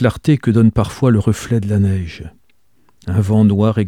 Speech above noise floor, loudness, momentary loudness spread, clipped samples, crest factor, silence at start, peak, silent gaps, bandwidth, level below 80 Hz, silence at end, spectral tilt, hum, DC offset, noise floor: 47 dB; -15 LUFS; 11 LU; under 0.1%; 14 dB; 0 s; 0 dBFS; none; 12.5 kHz; -38 dBFS; 0 s; -8 dB/octave; none; 0.3%; -61 dBFS